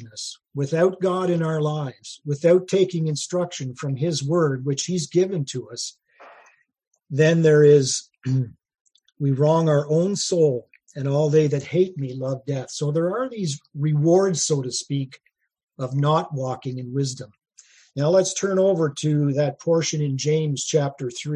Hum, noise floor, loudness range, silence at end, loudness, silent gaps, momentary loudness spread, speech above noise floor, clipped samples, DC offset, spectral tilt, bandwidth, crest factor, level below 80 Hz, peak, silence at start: none; -56 dBFS; 5 LU; 0 s; -22 LUFS; 6.87-6.91 s, 8.81-8.85 s, 15.63-15.67 s; 12 LU; 35 dB; under 0.1%; under 0.1%; -5.5 dB/octave; 11 kHz; 18 dB; -66 dBFS; -4 dBFS; 0 s